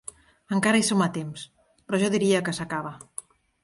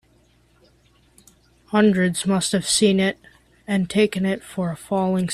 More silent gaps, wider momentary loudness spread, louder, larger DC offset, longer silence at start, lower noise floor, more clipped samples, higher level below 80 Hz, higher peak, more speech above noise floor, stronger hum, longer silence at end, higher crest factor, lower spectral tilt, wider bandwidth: neither; first, 19 LU vs 10 LU; second, -24 LUFS vs -21 LUFS; neither; second, 0.5 s vs 1.7 s; second, -44 dBFS vs -58 dBFS; neither; second, -64 dBFS vs -56 dBFS; about the same, -8 dBFS vs -6 dBFS; second, 20 dB vs 38 dB; neither; first, 0.65 s vs 0 s; about the same, 18 dB vs 16 dB; about the same, -4.5 dB/octave vs -4.5 dB/octave; second, 11.5 kHz vs 13.5 kHz